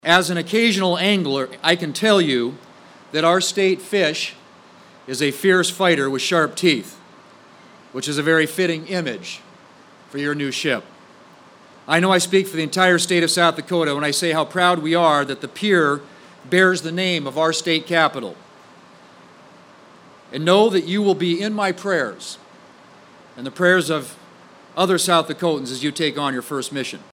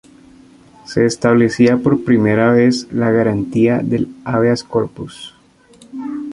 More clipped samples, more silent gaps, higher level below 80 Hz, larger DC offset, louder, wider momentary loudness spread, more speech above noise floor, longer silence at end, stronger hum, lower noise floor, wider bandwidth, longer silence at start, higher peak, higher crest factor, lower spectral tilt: neither; neither; second, -72 dBFS vs -48 dBFS; neither; second, -19 LUFS vs -15 LUFS; second, 12 LU vs 17 LU; second, 28 dB vs 33 dB; about the same, 0.1 s vs 0 s; neither; about the same, -47 dBFS vs -47 dBFS; first, 17 kHz vs 11 kHz; second, 0.05 s vs 0.9 s; about the same, -2 dBFS vs -2 dBFS; first, 20 dB vs 14 dB; second, -4 dB/octave vs -6.5 dB/octave